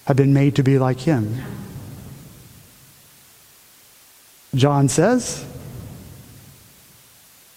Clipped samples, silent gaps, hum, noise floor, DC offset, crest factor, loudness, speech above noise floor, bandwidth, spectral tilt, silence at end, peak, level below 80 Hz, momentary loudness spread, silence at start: under 0.1%; none; none; -50 dBFS; under 0.1%; 22 dB; -18 LUFS; 33 dB; 16 kHz; -6.5 dB/octave; 1.4 s; 0 dBFS; -52 dBFS; 24 LU; 0.05 s